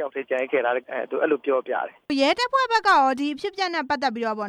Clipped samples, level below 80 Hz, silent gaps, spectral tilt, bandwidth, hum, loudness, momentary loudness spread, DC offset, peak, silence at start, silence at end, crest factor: under 0.1%; -66 dBFS; none; -3 dB/octave; 12.5 kHz; none; -23 LUFS; 9 LU; under 0.1%; -8 dBFS; 0 s; 0 s; 16 dB